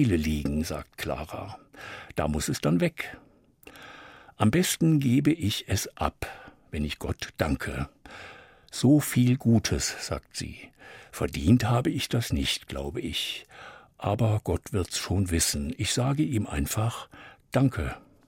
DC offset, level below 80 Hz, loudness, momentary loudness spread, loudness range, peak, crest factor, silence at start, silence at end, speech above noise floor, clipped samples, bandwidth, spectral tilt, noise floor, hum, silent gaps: under 0.1%; -44 dBFS; -27 LUFS; 20 LU; 5 LU; -8 dBFS; 20 dB; 0 s; 0.3 s; 27 dB; under 0.1%; 16.5 kHz; -5 dB/octave; -54 dBFS; none; none